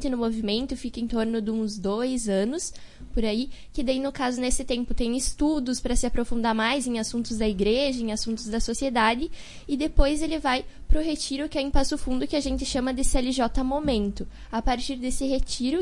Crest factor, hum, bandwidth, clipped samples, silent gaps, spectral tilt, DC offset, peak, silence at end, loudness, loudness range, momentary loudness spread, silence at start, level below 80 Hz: 22 dB; none; 11.5 kHz; under 0.1%; none; -4 dB/octave; under 0.1%; -4 dBFS; 0 s; -27 LUFS; 2 LU; 6 LU; 0 s; -32 dBFS